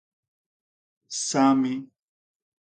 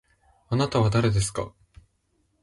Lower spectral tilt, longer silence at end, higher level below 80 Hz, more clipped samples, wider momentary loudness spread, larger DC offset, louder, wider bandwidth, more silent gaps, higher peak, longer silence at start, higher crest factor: second, -4 dB/octave vs -6 dB/octave; about the same, 0.85 s vs 0.95 s; second, -78 dBFS vs -44 dBFS; neither; first, 14 LU vs 11 LU; neither; about the same, -23 LUFS vs -24 LUFS; second, 9.4 kHz vs 11.5 kHz; neither; first, -6 dBFS vs -10 dBFS; first, 1.1 s vs 0.5 s; first, 22 dB vs 16 dB